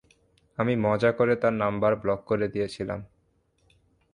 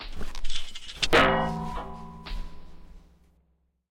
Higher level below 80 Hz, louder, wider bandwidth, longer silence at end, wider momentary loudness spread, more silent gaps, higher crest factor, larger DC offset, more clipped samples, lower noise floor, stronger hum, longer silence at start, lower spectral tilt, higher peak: second, -56 dBFS vs -38 dBFS; about the same, -26 LUFS vs -26 LUFS; second, 10.5 kHz vs 12 kHz; first, 1.1 s vs 0.95 s; second, 11 LU vs 21 LU; neither; about the same, 18 dB vs 22 dB; neither; neither; about the same, -68 dBFS vs -70 dBFS; neither; first, 0.6 s vs 0 s; first, -7.5 dB/octave vs -4 dB/octave; second, -10 dBFS vs -4 dBFS